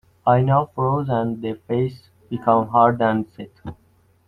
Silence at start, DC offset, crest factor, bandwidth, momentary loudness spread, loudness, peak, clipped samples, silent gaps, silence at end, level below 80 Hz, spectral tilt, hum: 0.25 s; under 0.1%; 18 dB; 4.9 kHz; 19 LU; -20 LUFS; -2 dBFS; under 0.1%; none; 0.55 s; -54 dBFS; -10 dB/octave; none